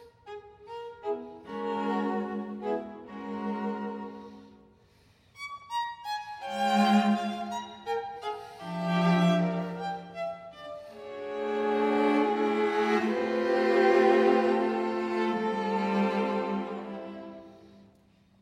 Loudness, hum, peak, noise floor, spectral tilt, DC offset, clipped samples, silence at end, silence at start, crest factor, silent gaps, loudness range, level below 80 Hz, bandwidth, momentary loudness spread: -29 LUFS; none; -10 dBFS; -62 dBFS; -6.5 dB/octave; under 0.1%; under 0.1%; 0.6 s; 0 s; 18 dB; none; 11 LU; -72 dBFS; 14.5 kHz; 19 LU